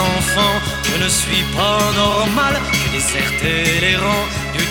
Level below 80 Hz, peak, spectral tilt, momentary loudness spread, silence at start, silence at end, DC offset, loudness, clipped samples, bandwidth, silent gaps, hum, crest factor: -32 dBFS; -2 dBFS; -3 dB/octave; 4 LU; 0 s; 0 s; under 0.1%; -15 LUFS; under 0.1%; 19 kHz; none; none; 14 dB